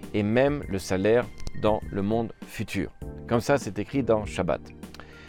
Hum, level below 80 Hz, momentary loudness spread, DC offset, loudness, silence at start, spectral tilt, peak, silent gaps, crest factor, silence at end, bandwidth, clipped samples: none; -46 dBFS; 13 LU; under 0.1%; -27 LUFS; 0 s; -6.5 dB/octave; -10 dBFS; none; 18 dB; 0 s; 18.5 kHz; under 0.1%